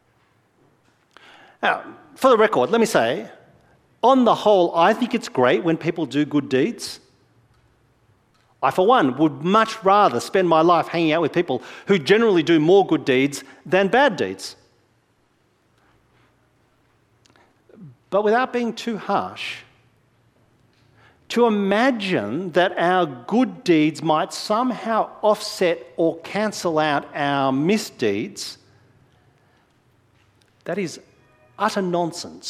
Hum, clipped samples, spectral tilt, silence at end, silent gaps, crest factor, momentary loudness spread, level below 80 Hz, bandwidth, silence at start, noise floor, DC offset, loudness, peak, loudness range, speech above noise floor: none; under 0.1%; -5 dB/octave; 0 s; none; 20 dB; 12 LU; -66 dBFS; 15.5 kHz; 1.6 s; -63 dBFS; under 0.1%; -20 LUFS; -2 dBFS; 9 LU; 44 dB